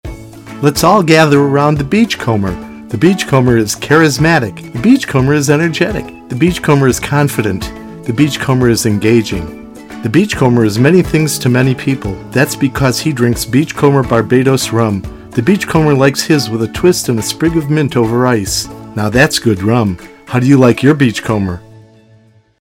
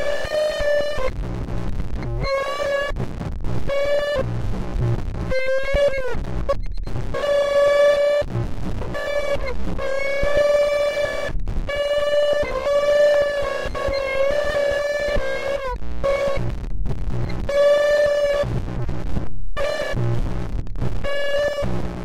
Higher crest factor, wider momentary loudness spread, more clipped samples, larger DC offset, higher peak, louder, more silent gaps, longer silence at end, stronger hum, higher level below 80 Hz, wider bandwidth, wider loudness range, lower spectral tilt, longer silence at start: about the same, 12 dB vs 12 dB; about the same, 11 LU vs 12 LU; first, 0.2% vs under 0.1%; neither; first, 0 dBFS vs -8 dBFS; first, -12 LUFS vs -22 LUFS; neither; first, 1.05 s vs 0 s; neither; second, -36 dBFS vs -30 dBFS; first, 17 kHz vs 14 kHz; about the same, 2 LU vs 4 LU; about the same, -5.5 dB/octave vs -5.5 dB/octave; about the same, 0.05 s vs 0 s